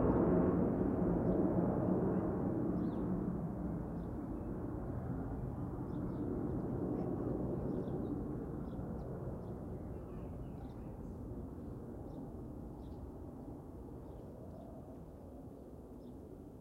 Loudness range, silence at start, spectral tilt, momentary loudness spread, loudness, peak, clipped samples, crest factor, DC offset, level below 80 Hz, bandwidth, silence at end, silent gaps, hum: 14 LU; 0 s; -11 dB/octave; 17 LU; -40 LUFS; -22 dBFS; under 0.1%; 18 dB; under 0.1%; -50 dBFS; 10.5 kHz; 0 s; none; none